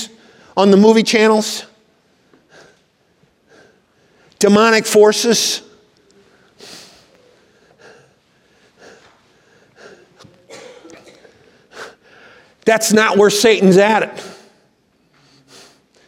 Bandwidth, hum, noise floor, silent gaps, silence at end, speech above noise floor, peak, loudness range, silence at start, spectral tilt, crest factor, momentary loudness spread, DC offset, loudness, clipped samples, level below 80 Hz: 16 kHz; none; -58 dBFS; none; 1.75 s; 47 dB; 0 dBFS; 8 LU; 0 s; -4 dB/octave; 18 dB; 26 LU; under 0.1%; -12 LUFS; under 0.1%; -64 dBFS